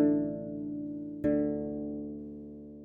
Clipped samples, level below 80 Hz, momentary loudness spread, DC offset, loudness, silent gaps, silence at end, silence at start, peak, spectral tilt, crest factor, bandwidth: under 0.1%; -58 dBFS; 14 LU; under 0.1%; -34 LUFS; none; 0 s; 0 s; -14 dBFS; -11.5 dB/octave; 18 dB; 2.7 kHz